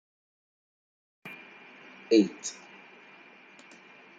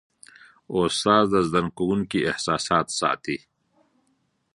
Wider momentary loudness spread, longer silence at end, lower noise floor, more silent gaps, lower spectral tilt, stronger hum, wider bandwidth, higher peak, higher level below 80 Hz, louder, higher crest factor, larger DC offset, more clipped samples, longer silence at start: first, 27 LU vs 10 LU; first, 1.65 s vs 1.2 s; second, -54 dBFS vs -70 dBFS; neither; about the same, -4.5 dB/octave vs -4.5 dB/octave; neither; second, 9.2 kHz vs 11.5 kHz; second, -10 dBFS vs -4 dBFS; second, -84 dBFS vs -54 dBFS; second, -27 LUFS vs -23 LUFS; about the same, 24 dB vs 22 dB; neither; neither; first, 1.25 s vs 0.7 s